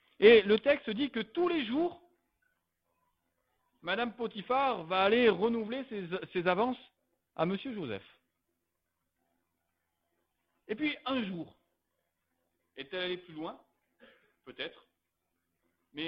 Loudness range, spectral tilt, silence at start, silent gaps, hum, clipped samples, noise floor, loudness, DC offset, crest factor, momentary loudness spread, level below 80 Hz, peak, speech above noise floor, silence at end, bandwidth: 13 LU; -8.5 dB/octave; 0.2 s; none; none; under 0.1%; -84 dBFS; -31 LUFS; under 0.1%; 24 dB; 18 LU; -70 dBFS; -10 dBFS; 54 dB; 0 s; 5.6 kHz